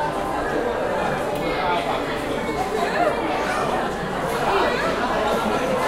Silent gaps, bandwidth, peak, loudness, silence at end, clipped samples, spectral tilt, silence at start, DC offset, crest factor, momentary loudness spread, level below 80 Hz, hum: none; 16 kHz; -8 dBFS; -22 LUFS; 0 s; under 0.1%; -4.5 dB/octave; 0 s; under 0.1%; 14 dB; 4 LU; -42 dBFS; none